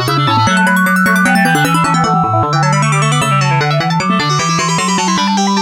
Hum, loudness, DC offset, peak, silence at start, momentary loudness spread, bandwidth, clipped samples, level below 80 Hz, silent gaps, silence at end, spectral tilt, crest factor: none; -11 LUFS; under 0.1%; 0 dBFS; 0 s; 3 LU; 17 kHz; under 0.1%; -46 dBFS; none; 0 s; -4.5 dB/octave; 12 dB